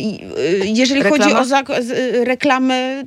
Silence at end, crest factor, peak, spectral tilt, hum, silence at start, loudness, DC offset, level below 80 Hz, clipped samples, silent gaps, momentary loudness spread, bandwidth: 0 s; 16 dB; 0 dBFS; -4 dB/octave; none; 0 s; -15 LUFS; under 0.1%; -60 dBFS; under 0.1%; none; 6 LU; 13 kHz